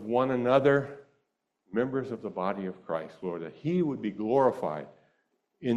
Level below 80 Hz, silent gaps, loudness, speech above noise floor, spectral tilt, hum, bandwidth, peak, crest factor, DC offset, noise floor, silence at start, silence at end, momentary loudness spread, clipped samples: -68 dBFS; none; -29 LUFS; 50 dB; -8.5 dB/octave; none; 8.8 kHz; -10 dBFS; 20 dB; under 0.1%; -78 dBFS; 0 s; 0 s; 13 LU; under 0.1%